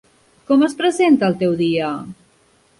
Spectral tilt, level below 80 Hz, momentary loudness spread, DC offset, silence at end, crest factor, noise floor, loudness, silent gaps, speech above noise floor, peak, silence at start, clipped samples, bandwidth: -6 dB/octave; -58 dBFS; 12 LU; under 0.1%; 0.65 s; 14 dB; -56 dBFS; -17 LUFS; none; 40 dB; -4 dBFS; 0.5 s; under 0.1%; 11.5 kHz